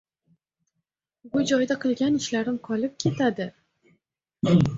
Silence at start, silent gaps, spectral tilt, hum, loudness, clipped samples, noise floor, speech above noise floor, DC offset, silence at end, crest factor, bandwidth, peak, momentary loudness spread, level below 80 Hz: 1.25 s; none; -6 dB/octave; none; -25 LUFS; under 0.1%; -82 dBFS; 58 dB; under 0.1%; 0 s; 18 dB; 7.8 kHz; -8 dBFS; 7 LU; -56 dBFS